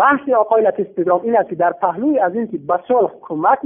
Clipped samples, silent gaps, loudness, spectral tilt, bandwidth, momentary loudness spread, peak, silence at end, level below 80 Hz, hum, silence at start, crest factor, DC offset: under 0.1%; none; -17 LUFS; -11.5 dB/octave; 3.6 kHz; 6 LU; -2 dBFS; 0 s; -62 dBFS; none; 0 s; 14 dB; under 0.1%